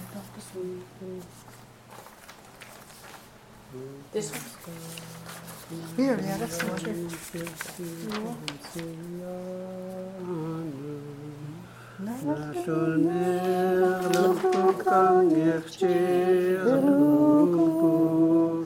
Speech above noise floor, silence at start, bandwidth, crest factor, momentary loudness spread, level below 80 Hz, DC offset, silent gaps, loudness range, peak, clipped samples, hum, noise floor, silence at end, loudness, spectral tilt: 23 dB; 0 s; 17 kHz; 18 dB; 21 LU; -64 dBFS; under 0.1%; none; 18 LU; -8 dBFS; under 0.1%; none; -50 dBFS; 0 s; -25 LUFS; -6.5 dB/octave